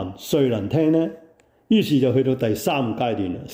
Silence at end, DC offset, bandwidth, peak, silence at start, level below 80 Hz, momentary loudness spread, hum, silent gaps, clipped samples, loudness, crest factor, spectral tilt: 0 s; under 0.1%; 16.5 kHz; -8 dBFS; 0 s; -58 dBFS; 5 LU; none; none; under 0.1%; -21 LUFS; 14 dB; -6.5 dB/octave